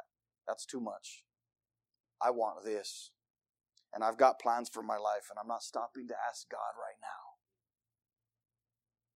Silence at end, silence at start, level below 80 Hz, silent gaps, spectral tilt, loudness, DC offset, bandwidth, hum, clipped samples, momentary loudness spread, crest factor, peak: 1.85 s; 0.45 s; under -90 dBFS; 2.00-2.04 s, 3.30-3.34 s; -2.5 dB/octave; -36 LUFS; under 0.1%; 15.5 kHz; none; under 0.1%; 20 LU; 26 dB; -12 dBFS